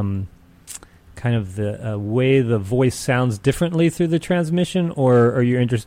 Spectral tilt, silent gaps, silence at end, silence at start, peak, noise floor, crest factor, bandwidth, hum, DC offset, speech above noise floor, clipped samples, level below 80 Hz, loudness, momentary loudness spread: -7 dB/octave; none; 0.05 s; 0 s; -6 dBFS; -40 dBFS; 14 dB; 16 kHz; none; under 0.1%; 22 dB; under 0.1%; -46 dBFS; -19 LUFS; 13 LU